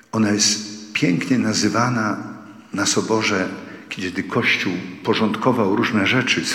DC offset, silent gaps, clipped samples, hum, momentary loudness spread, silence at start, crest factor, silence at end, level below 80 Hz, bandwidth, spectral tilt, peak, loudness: under 0.1%; none; under 0.1%; none; 11 LU; 0.15 s; 18 dB; 0 s; -64 dBFS; 16 kHz; -3.5 dB/octave; -2 dBFS; -19 LUFS